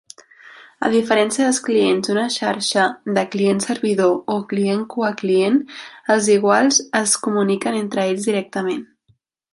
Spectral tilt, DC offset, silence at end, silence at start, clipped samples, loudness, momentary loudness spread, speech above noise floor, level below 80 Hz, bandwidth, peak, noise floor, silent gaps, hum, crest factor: -3.5 dB/octave; under 0.1%; 0.7 s; 0.45 s; under 0.1%; -18 LUFS; 7 LU; 43 dB; -68 dBFS; 11.5 kHz; -2 dBFS; -62 dBFS; none; none; 18 dB